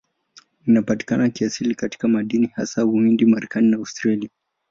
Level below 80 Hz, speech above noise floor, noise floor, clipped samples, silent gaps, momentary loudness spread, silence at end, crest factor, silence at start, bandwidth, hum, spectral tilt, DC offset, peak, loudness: -60 dBFS; 34 dB; -53 dBFS; under 0.1%; none; 7 LU; 0.45 s; 14 dB; 0.65 s; 7.6 kHz; none; -6 dB/octave; under 0.1%; -6 dBFS; -20 LUFS